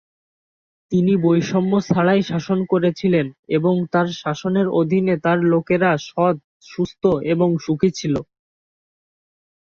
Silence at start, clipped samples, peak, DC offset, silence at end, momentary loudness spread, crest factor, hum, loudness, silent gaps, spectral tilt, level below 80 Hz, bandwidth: 0.9 s; under 0.1%; -2 dBFS; under 0.1%; 1.4 s; 6 LU; 16 dB; none; -19 LUFS; 3.39-3.43 s, 6.44-6.60 s; -7 dB/octave; -56 dBFS; 7 kHz